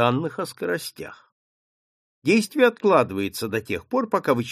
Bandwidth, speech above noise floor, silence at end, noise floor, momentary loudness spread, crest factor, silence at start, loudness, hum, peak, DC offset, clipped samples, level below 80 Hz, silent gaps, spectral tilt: 15.5 kHz; over 68 dB; 0 s; under -90 dBFS; 11 LU; 20 dB; 0 s; -23 LUFS; none; -4 dBFS; under 0.1%; under 0.1%; -62 dBFS; 1.32-2.22 s; -5.5 dB/octave